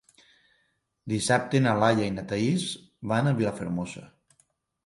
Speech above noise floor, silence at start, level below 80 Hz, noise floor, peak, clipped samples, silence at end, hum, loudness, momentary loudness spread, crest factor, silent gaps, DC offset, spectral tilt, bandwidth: 47 dB; 1.05 s; -58 dBFS; -73 dBFS; -6 dBFS; under 0.1%; 0.8 s; none; -26 LUFS; 14 LU; 22 dB; none; under 0.1%; -5.5 dB/octave; 11.5 kHz